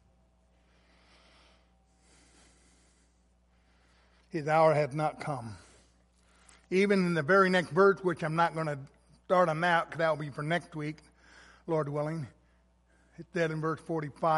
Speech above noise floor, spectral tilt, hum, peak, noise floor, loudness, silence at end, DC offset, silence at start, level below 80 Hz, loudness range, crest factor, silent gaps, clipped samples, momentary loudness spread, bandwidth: 38 dB; -6.5 dB/octave; none; -10 dBFS; -67 dBFS; -29 LUFS; 0 s; under 0.1%; 4.35 s; -66 dBFS; 9 LU; 20 dB; none; under 0.1%; 16 LU; 11.5 kHz